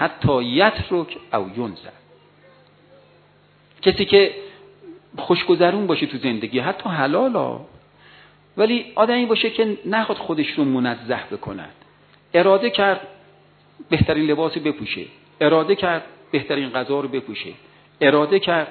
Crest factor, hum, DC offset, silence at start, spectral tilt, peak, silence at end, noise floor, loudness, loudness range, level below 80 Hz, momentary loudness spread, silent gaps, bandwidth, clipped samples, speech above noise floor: 20 dB; 50 Hz at -55 dBFS; under 0.1%; 0 s; -9 dB/octave; 0 dBFS; 0 s; -54 dBFS; -20 LUFS; 3 LU; -50 dBFS; 15 LU; none; 4.6 kHz; under 0.1%; 35 dB